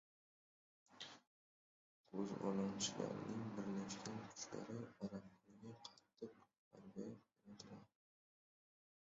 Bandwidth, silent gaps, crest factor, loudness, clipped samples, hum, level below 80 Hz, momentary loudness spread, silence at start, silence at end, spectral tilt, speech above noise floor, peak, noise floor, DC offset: 7.6 kHz; 1.27-2.04 s, 6.58-6.71 s; 22 dB; -49 LUFS; under 0.1%; none; -84 dBFS; 19 LU; 0.9 s; 1.25 s; -5 dB/octave; over 42 dB; -30 dBFS; under -90 dBFS; under 0.1%